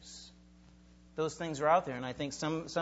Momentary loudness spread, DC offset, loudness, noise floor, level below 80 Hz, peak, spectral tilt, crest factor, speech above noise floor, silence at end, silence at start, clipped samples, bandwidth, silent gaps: 21 LU; under 0.1%; -34 LUFS; -59 dBFS; -62 dBFS; -14 dBFS; -4.5 dB/octave; 22 dB; 26 dB; 0 s; 0 s; under 0.1%; 8 kHz; none